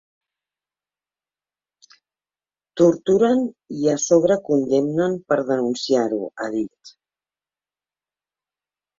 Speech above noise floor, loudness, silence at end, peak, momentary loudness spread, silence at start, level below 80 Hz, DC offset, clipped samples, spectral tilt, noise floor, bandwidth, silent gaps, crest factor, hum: over 71 dB; -20 LUFS; 2.1 s; -4 dBFS; 9 LU; 2.75 s; -64 dBFS; under 0.1%; under 0.1%; -5.5 dB/octave; under -90 dBFS; 7.8 kHz; none; 20 dB; 50 Hz at -55 dBFS